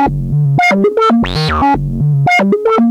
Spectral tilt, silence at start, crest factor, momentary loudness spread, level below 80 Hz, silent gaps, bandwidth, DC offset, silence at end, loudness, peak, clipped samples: -7 dB/octave; 0 s; 8 dB; 4 LU; -28 dBFS; none; 11.5 kHz; under 0.1%; 0 s; -11 LUFS; -2 dBFS; under 0.1%